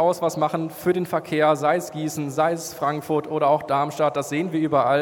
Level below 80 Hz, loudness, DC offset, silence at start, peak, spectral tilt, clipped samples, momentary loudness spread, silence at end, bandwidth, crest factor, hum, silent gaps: -68 dBFS; -23 LUFS; under 0.1%; 0 s; -6 dBFS; -5.5 dB/octave; under 0.1%; 6 LU; 0 s; 18 kHz; 16 dB; none; none